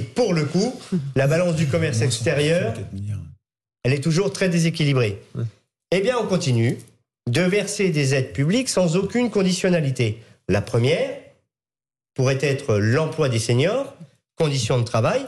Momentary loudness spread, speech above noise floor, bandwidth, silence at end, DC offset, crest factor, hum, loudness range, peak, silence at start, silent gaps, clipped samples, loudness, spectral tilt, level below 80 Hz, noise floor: 11 LU; over 70 dB; 12.5 kHz; 0 s; under 0.1%; 12 dB; none; 2 LU; -10 dBFS; 0 s; none; under 0.1%; -21 LUFS; -5.5 dB/octave; -54 dBFS; under -90 dBFS